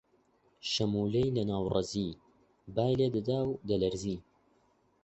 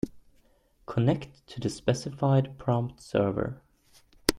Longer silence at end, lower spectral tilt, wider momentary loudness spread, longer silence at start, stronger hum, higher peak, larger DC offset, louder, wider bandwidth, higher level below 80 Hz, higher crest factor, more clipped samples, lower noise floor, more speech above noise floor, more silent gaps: first, 0.85 s vs 0 s; about the same, -6.5 dB/octave vs -6 dB/octave; second, 9 LU vs 12 LU; first, 0.65 s vs 0.05 s; neither; second, -14 dBFS vs -2 dBFS; neither; second, -32 LUFS vs -29 LUFS; second, 8.2 kHz vs 16.5 kHz; about the same, -56 dBFS vs -52 dBFS; second, 18 dB vs 28 dB; neither; first, -70 dBFS vs -64 dBFS; about the same, 39 dB vs 36 dB; neither